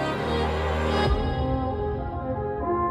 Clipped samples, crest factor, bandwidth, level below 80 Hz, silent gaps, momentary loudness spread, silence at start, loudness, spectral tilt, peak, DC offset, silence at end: under 0.1%; 14 dB; 11 kHz; -32 dBFS; none; 6 LU; 0 s; -26 LUFS; -7 dB/octave; -12 dBFS; under 0.1%; 0 s